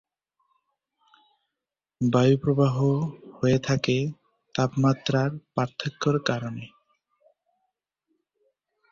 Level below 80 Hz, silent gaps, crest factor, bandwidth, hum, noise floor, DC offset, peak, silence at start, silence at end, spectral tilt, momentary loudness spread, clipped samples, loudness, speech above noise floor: -60 dBFS; none; 20 dB; 7.4 kHz; none; -88 dBFS; under 0.1%; -8 dBFS; 2 s; 2.25 s; -6.5 dB/octave; 12 LU; under 0.1%; -25 LUFS; 64 dB